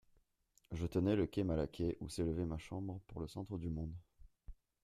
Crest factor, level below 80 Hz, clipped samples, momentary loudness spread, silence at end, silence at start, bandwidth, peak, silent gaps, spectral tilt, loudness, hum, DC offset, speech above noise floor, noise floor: 20 dB; -56 dBFS; under 0.1%; 12 LU; 0.3 s; 0.7 s; 14 kHz; -22 dBFS; none; -7.5 dB/octave; -41 LUFS; none; under 0.1%; 37 dB; -76 dBFS